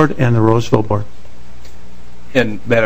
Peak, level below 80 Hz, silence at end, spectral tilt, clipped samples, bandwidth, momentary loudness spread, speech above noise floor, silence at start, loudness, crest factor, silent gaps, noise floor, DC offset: 0 dBFS; -40 dBFS; 0 s; -7.5 dB/octave; 0.2%; 15 kHz; 8 LU; 25 dB; 0 s; -15 LUFS; 16 dB; none; -39 dBFS; 10%